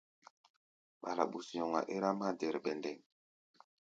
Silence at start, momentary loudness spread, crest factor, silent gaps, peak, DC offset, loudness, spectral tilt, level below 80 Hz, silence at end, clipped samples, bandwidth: 1.05 s; 9 LU; 24 dB; none; -16 dBFS; under 0.1%; -38 LUFS; -5.5 dB/octave; -88 dBFS; 0.9 s; under 0.1%; 8.6 kHz